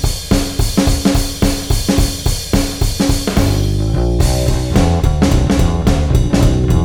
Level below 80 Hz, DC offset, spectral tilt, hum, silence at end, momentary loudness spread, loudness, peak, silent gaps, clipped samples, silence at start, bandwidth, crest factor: -18 dBFS; under 0.1%; -5.5 dB/octave; none; 0 s; 3 LU; -15 LUFS; 0 dBFS; none; under 0.1%; 0 s; 17.5 kHz; 12 dB